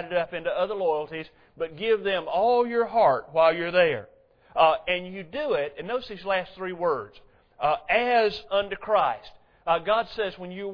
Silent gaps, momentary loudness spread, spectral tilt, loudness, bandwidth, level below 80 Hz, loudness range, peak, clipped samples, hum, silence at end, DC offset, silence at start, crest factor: none; 13 LU; -6.5 dB/octave; -25 LUFS; 5.4 kHz; -58 dBFS; 4 LU; -8 dBFS; under 0.1%; none; 0 s; under 0.1%; 0 s; 18 dB